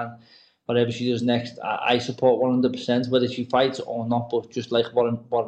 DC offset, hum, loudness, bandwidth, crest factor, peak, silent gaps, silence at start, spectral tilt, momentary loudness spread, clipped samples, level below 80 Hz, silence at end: under 0.1%; none; -23 LUFS; 8.6 kHz; 16 dB; -6 dBFS; none; 0 s; -6 dB/octave; 7 LU; under 0.1%; -64 dBFS; 0 s